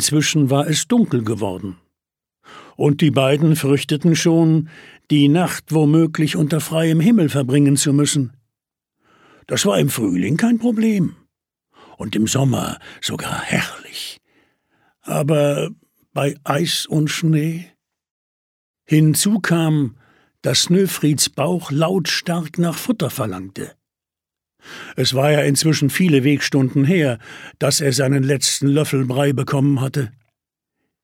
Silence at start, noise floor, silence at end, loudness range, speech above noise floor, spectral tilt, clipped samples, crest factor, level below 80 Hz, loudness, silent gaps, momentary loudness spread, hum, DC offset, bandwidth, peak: 0 s; -87 dBFS; 0.95 s; 6 LU; 70 dB; -5 dB/octave; under 0.1%; 18 dB; -58 dBFS; -17 LUFS; 18.11-18.74 s; 11 LU; none; under 0.1%; 17 kHz; 0 dBFS